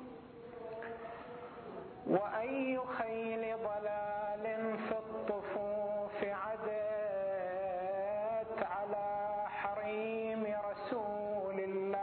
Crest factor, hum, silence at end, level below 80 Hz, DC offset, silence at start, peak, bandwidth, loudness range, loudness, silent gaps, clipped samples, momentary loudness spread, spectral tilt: 20 dB; none; 0 s; -72 dBFS; under 0.1%; 0 s; -18 dBFS; 4.3 kHz; 1 LU; -39 LUFS; none; under 0.1%; 10 LU; -4.5 dB/octave